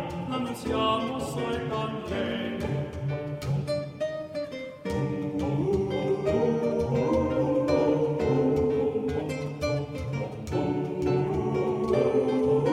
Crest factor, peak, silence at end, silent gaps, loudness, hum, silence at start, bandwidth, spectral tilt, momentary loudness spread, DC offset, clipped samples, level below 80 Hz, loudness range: 16 dB; -12 dBFS; 0 s; none; -28 LUFS; none; 0 s; 13.5 kHz; -7 dB/octave; 8 LU; under 0.1%; under 0.1%; -48 dBFS; 6 LU